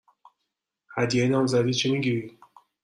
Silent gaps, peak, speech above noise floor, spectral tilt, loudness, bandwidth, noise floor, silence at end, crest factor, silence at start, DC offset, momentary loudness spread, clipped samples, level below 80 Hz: none; -10 dBFS; 59 dB; -5.5 dB/octave; -24 LUFS; 11 kHz; -82 dBFS; 0.55 s; 16 dB; 0.9 s; under 0.1%; 11 LU; under 0.1%; -64 dBFS